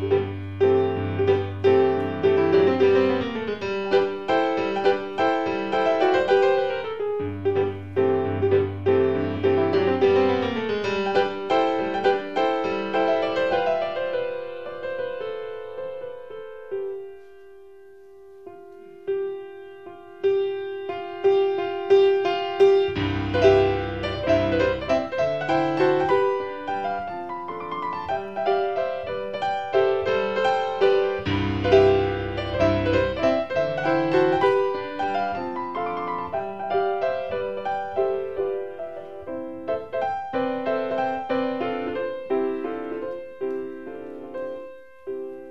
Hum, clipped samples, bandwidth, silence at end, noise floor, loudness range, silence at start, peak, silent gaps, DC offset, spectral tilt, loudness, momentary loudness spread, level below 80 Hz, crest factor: none; under 0.1%; 7.2 kHz; 0 s; -47 dBFS; 10 LU; 0 s; -4 dBFS; none; 0.4%; -7 dB/octave; -23 LUFS; 14 LU; -50 dBFS; 20 dB